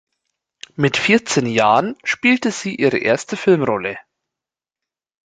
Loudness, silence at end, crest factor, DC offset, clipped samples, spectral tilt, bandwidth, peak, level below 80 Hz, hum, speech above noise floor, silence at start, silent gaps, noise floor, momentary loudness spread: -17 LUFS; 1.25 s; 18 dB; under 0.1%; under 0.1%; -4.5 dB/octave; 9.4 kHz; -2 dBFS; -58 dBFS; none; 70 dB; 0.8 s; none; -88 dBFS; 8 LU